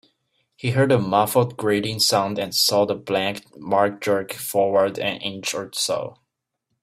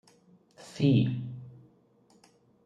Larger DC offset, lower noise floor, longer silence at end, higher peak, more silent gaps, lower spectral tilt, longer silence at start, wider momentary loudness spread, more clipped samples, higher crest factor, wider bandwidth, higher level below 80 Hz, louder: neither; first, -77 dBFS vs -64 dBFS; second, 0.7 s vs 1.15 s; first, -4 dBFS vs -12 dBFS; neither; second, -4 dB/octave vs -8 dB/octave; about the same, 0.65 s vs 0.6 s; second, 9 LU vs 26 LU; neither; about the same, 18 dB vs 20 dB; first, 16 kHz vs 9.8 kHz; first, -62 dBFS vs -70 dBFS; first, -21 LUFS vs -27 LUFS